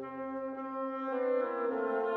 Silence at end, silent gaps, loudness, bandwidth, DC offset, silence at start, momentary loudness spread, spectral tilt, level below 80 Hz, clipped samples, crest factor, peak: 0 s; none; -35 LUFS; 4.4 kHz; under 0.1%; 0 s; 7 LU; -7.5 dB/octave; -80 dBFS; under 0.1%; 12 dB; -22 dBFS